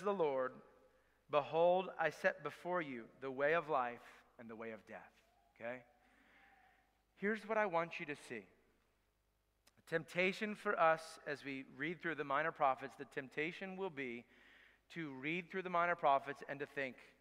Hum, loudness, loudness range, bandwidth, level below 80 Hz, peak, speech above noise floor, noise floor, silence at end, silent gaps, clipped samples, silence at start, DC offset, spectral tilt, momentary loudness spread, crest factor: none; -40 LUFS; 6 LU; 15 kHz; -82 dBFS; -20 dBFS; 41 dB; -81 dBFS; 0.15 s; none; under 0.1%; 0 s; under 0.1%; -5.5 dB/octave; 16 LU; 22 dB